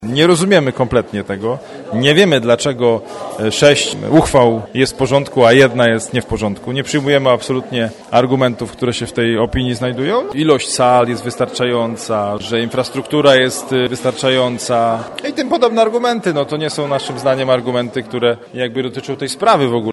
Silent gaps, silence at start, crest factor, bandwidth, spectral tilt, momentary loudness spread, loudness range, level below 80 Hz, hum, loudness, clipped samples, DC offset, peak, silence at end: none; 0 s; 14 dB; 12 kHz; -5 dB/octave; 10 LU; 4 LU; -42 dBFS; none; -15 LUFS; under 0.1%; under 0.1%; 0 dBFS; 0 s